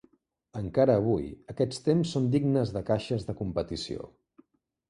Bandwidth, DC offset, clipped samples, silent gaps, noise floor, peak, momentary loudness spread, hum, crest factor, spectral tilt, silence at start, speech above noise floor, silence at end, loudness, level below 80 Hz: 11 kHz; under 0.1%; under 0.1%; none; -65 dBFS; -10 dBFS; 14 LU; none; 18 dB; -7.5 dB/octave; 0.55 s; 37 dB; 0.8 s; -28 LUFS; -52 dBFS